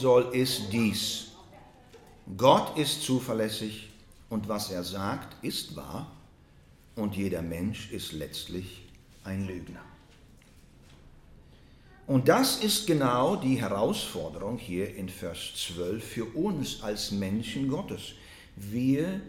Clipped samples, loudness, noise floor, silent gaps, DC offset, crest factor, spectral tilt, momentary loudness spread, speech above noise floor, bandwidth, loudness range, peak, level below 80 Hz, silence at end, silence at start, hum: under 0.1%; -29 LUFS; -56 dBFS; none; under 0.1%; 24 dB; -4.5 dB/octave; 19 LU; 27 dB; 17.5 kHz; 11 LU; -6 dBFS; -56 dBFS; 0 s; 0 s; none